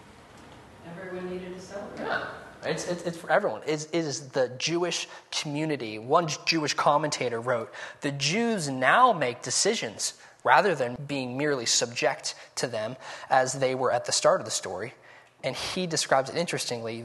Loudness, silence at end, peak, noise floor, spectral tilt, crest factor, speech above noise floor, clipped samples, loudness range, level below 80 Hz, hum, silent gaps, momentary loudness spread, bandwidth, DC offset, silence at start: -27 LUFS; 0 s; -6 dBFS; -50 dBFS; -3 dB/octave; 22 dB; 23 dB; under 0.1%; 6 LU; -68 dBFS; none; none; 13 LU; 12.5 kHz; under 0.1%; 0 s